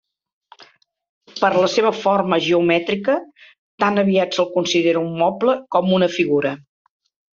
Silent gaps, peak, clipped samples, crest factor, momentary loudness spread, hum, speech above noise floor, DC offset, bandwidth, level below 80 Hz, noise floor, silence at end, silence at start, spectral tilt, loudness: 1.09-1.21 s, 3.58-3.78 s; -2 dBFS; under 0.1%; 16 dB; 5 LU; none; 33 dB; under 0.1%; 7.6 kHz; -62 dBFS; -51 dBFS; 0.85 s; 0.6 s; -5.5 dB/octave; -18 LUFS